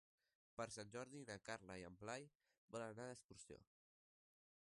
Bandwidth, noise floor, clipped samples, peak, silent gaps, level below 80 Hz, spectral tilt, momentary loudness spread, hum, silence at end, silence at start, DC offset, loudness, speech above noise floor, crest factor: 11.5 kHz; under -90 dBFS; under 0.1%; -34 dBFS; 2.35-2.40 s, 2.58-2.68 s, 3.24-3.29 s; -82 dBFS; -4 dB/octave; 10 LU; none; 1 s; 0.6 s; under 0.1%; -55 LUFS; over 35 dB; 22 dB